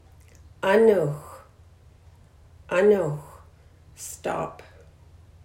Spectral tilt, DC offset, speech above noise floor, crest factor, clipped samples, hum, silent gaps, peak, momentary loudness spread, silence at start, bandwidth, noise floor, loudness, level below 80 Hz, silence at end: -6 dB/octave; under 0.1%; 31 dB; 20 dB; under 0.1%; none; none; -6 dBFS; 19 LU; 0.65 s; 16 kHz; -52 dBFS; -23 LUFS; -56 dBFS; 0.9 s